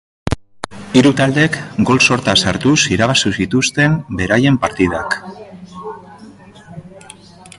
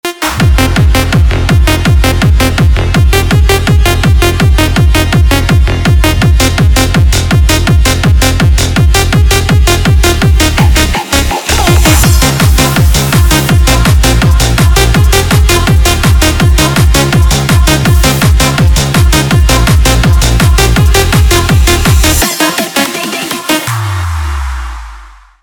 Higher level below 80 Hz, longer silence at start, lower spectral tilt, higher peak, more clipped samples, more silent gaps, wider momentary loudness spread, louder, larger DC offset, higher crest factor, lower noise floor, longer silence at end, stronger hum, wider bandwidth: second, -38 dBFS vs -10 dBFS; first, 0.25 s vs 0.05 s; about the same, -4.5 dB/octave vs -4.5 dB/octave; about the same, 0 dBFS vs 0 dBFS; second, under 0.1% vs 0.2%; neither; first, 20 LU vs 4 LU; second, -14 LUFS vs -8 LUFS; neither; first, 16 dB vs 6 dB; first, -39 dBFS vs -32 dBFS; first, 0.6 s vs 0.35 s; neither; second, 11.5 kHz vs 20 kHz